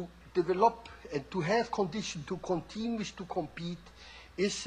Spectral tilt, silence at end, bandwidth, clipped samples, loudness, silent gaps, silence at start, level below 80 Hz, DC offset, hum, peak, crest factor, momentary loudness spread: -5 dB/octave; 0 s; 10 kHz; under 0.1%; -33 LUFS; none; 0 s; -58 dBFS; under 0.1%; none; -12 dBFS; 22 dB; 17 LU